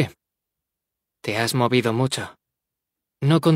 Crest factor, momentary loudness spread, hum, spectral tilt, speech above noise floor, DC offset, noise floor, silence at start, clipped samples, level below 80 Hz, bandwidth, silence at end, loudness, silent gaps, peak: 20 dB; 11 LU; none; -5.5 dB/octave; 65 dB; under 0.1%; -84 dBFS; 0 s; under 0.1%; -64 dBFS; 16 kHz; 0 s; -22 LUFS; none; -4 dBFS